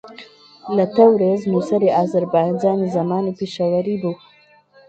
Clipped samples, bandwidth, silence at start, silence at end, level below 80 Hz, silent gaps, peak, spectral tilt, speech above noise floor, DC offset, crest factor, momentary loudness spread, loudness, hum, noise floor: under 0.1%; 8.2 kHz; 0.05 s; 0.75 s; -62 dBFS; none; 0 dBFS; -8 dB/octave; 34 dB; under 0.1%; 18 dB; 11 LU; -18 LUFS; none; -51 dBFS